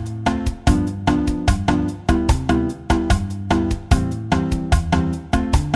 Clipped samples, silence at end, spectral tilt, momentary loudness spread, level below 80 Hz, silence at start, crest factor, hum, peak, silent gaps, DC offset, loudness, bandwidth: under 0.1%; 0 s; -6.5 dB/octave; 3 LU; -24 dBFS; 0 s; 16 dB; none; -2 dBFS; none; under 0.1%; -20 LUFS; 12.5 kHz